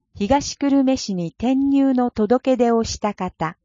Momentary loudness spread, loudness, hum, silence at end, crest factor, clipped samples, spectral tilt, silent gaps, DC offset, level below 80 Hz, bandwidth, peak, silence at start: 8 LU; -20 LUFS; none; 0.15 s; 16 dB; under 0.1%; -5.5 dB/octave; none; under 0.1%; -44 dBFS; 7.6 kHz; -4 dBFS; 0.15 s